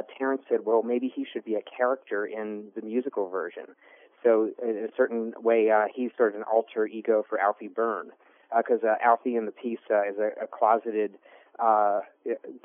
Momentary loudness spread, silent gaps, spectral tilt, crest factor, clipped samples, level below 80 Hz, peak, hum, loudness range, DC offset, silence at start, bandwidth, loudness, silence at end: 11 LU; none; 1 dB/octave; 20 dB; under 0.1%; under -90 dBFS; -8 dBFS; none; 4 LU; under 0.1%; 0 s; 3.6 kHz; -27 LUFS; 0.05 s